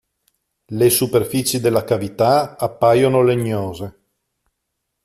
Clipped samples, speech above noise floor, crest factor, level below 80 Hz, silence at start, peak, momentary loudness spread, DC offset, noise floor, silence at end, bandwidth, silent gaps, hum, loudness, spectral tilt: under 0.1%; 59 dB; 16 dB; -54 dBFS; 0.7 s; -2 dBFS; 12 LU; under 0.1%; -76 dBFS; 1.15 s; 15 kHz; none; none; -17 LUFS; -5 dB/octave